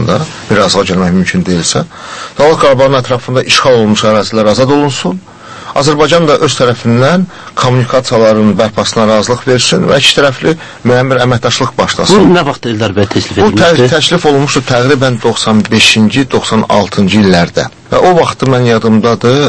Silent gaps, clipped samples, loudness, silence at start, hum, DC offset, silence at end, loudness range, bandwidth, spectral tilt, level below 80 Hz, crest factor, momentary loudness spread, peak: none; 1%; -8 LUFS; 0 s; none; under 0.1%; 0 s; 2 LU; 11 kHz; -5 dB/octave; -38 dBFS; 8 dB; 7 LU; 0 dBFS